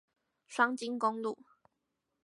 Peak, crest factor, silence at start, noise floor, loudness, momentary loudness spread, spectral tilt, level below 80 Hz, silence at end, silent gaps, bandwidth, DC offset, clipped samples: -14 dBFS; 22 dB; 0.5 s; -84 dBFS; -33 LUFS; 11 LU; -3.5 dB/octave; under -90 dBFS; 0.9 s; none; 11.5 kHz; under 0.1%; under 0.1%